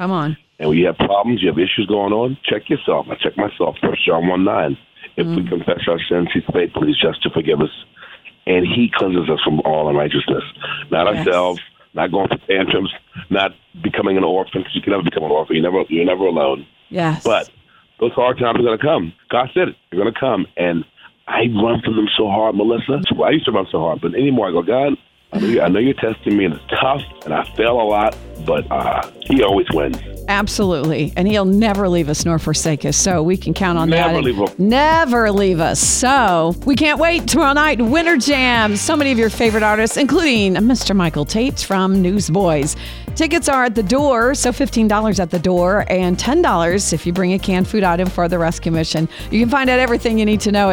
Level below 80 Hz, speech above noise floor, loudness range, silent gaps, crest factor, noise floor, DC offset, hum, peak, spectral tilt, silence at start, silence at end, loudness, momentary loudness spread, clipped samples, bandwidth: -36 dBFS; 24 dB; 4 LU; none; 14 dB; -40 dBFS; under 0.1%; none; -2 dBFS; -4.5 dB/octave; 0 s; 0 s; -16 LUFS; 7 LU; under 0.1%; 18 kHz